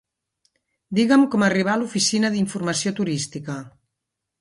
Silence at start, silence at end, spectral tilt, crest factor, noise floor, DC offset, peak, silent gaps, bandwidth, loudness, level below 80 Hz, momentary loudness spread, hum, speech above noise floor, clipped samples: 0.9 s; 0.75 s; -4 dB/octave; 16 dB; -82 dBFS; under 0.1%; -6 dBFS; none; 11.5 kHz; -21 LUFS; -64 dBFS; 13 LU; none; 61 dB; under 0.1%